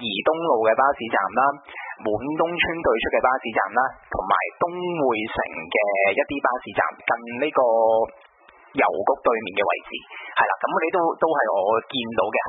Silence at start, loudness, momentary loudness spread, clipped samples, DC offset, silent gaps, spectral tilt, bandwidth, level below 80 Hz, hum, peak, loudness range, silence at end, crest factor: 0 s; -22 LUFS; 7 LU; under 0.1%; under 0.1%; none; -9 dB/octave; 4.1 kHz; -54 dBFS; none; -4 dBFS; 1 LU; 0 s; 18 dB